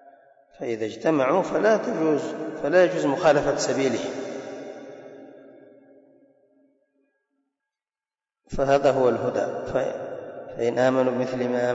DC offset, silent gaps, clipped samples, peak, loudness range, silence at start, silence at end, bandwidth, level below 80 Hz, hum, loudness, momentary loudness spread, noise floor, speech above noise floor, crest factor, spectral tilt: under 0.1%; none; under 0.1%; -8 dBFS; 14 LU; 0.6 s; 0 s; 8 kHz; -52 dBFS; none; -23 LUFS; 17 LU; under -90 dBFS; over 68 dB; 16 dB; -5.5 dB/octave